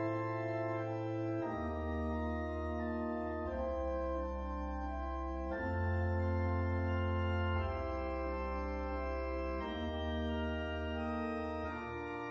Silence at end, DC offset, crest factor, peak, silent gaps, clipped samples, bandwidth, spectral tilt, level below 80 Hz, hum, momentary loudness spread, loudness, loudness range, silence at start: 0 s; under 0.1%; 12 dB; -24 dBFS; none; under 0.1%; 6.6 kHz; -6.5 dB/octave; -44 dBFS; none; 5 LU; -38 LUFS; 3 LU; 0 s